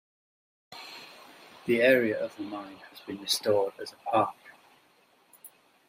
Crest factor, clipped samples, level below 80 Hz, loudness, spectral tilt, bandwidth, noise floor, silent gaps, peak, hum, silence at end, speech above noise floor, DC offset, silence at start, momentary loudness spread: 24 dB; under 0.1%; -78 dBFS; -28 LUFS; -3.5 dB/octave; 16 kHz; -64 dBFS; none; -8 dBFS; none; 0.4 s; 36 dB; under 0.1%; 0.7 s; 23 LU